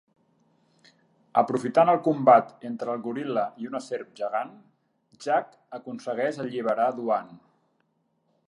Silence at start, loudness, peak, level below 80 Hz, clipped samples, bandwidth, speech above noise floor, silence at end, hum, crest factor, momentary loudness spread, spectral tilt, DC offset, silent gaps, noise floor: 1.35 s; -26 LUFS; -4 dBFS; -82 dBFS; under 0.1%; 11 kHz; 47 dB; 1.1 s; none; 22 dB; 16 LU; -6.5 dB/octave; under 0.1%; none; -72 dBFS